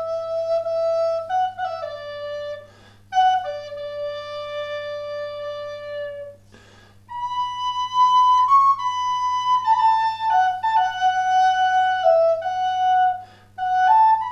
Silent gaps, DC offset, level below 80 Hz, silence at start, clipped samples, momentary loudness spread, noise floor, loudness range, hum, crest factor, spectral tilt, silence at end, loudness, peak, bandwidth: none; under 0.1%; -62 dBFS; 0 s; under 0.1%; 16 LU; -49 dBFS; 12 LU; none; 14 dB; -1.5 dB/octave; 0 s; -20 LUFS; -6 dBFS; 8 kHz